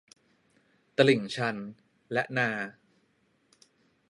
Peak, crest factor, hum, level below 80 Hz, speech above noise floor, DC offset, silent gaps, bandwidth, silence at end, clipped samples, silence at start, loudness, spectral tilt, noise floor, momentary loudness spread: -8 dBFS; 24 dB; none; -78 dBFS; 43 dB; under 0.1%; none; 11.5 kHz; 1.4 s; under 0.1%; 1 s; -29 LUFS; -5.5 dB/octave; -70 dBFS; 17 LU